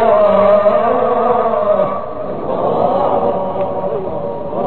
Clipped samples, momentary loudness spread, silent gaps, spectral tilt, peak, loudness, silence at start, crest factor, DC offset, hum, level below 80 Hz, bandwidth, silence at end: under 0.1%; 11 LU; none; -9 dB/octave; 0 dBFS; -15 LUFS; 0 s; 14 dB; 4%; none; -46 dBFS; 4.4 kHz; 0 s